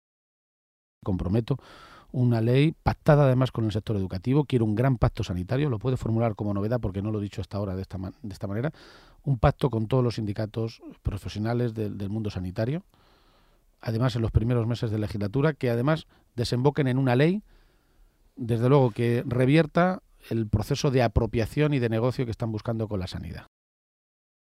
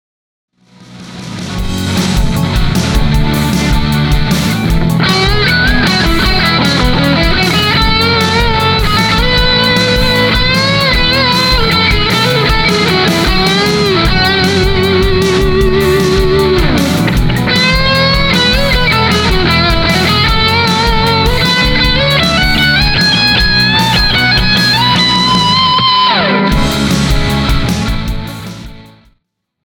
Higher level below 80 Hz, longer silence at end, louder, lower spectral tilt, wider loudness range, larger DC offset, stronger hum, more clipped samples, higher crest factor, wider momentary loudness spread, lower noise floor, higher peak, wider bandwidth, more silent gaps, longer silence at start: second, -44 dBFS vs -18 dBFS; first, 1 s vs 0.85 s; second, -26 LUFS vs -9 LUFS; first, -8 dB/octave vs -4.5 dB/octave; about the same, 6 LU vs 4 LU; neither; neither; neither; first, 20 dB vs 10 dB; first, 12 LU vs 5 LU; about the same, -62 dBFS vs -62 dBFS; second, -6 dBFS vs 0 dBFS; second, 13.5 kHz vs over 20 kHz; neither; first, 1.05 s vs 0.9 s